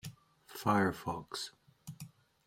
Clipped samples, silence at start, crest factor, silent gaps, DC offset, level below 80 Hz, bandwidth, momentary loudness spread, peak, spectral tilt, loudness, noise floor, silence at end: under 0.1%; 0.05 s; 22 dB; none; under 0.1%; -68 dBFS; 16.5 kHz; 22 LU; -16 dBFS; -5 dB/octave; -35 LUFS; -55 dBFS; 0.4 s